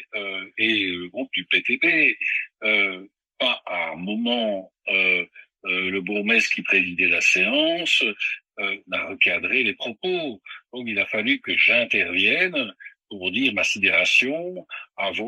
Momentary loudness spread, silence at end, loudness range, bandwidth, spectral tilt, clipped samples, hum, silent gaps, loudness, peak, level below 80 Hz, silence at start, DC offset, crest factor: 13 LU; 0 s; 4 LU; 13 kHz; -2.5 dB/octave; under 0.1%; none; none; -21 LUFS; -4 dBFS; -74 dBFS; 0 s; under 0.1%; 18 dB